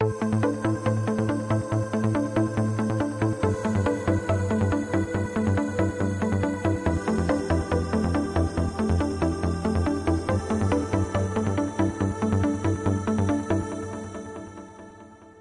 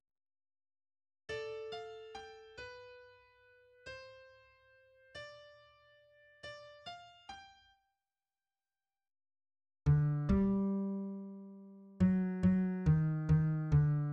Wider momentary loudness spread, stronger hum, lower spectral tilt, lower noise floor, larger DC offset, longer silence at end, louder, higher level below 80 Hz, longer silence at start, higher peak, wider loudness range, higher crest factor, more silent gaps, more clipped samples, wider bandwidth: second, 3 LU vs 22 LU; neither; second, -7.5 dB/octave vs -9 dB/octave; second, -47 dBFS vs under -90 dBFS; neither; about the same, 0 s vs 0 s; first, -26 LUFS vs -34 LUFS; first, -44 dBFS vs -52 dBFS; second, 0 s vs 1.3 s; first, -10 dBFS vs -20 dBFS; second, 1 LU vs 21 LU; about the same, 14 dB vs 18 dB; neither; neither; first, 11.5 kHz vs 6.8 kHz